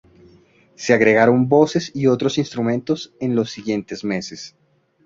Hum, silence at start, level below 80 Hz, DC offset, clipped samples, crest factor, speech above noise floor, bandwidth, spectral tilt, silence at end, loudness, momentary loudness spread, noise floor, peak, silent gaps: none; 0.8 s; -58 dBFS; under 0.1%; under 0.1%; 18 dB; 34 dB; 7.6 kHz; -6 dB/octave; 0.55 s; -19 LUFS; 13 LU; -53 dBFS; -2 dBFS; none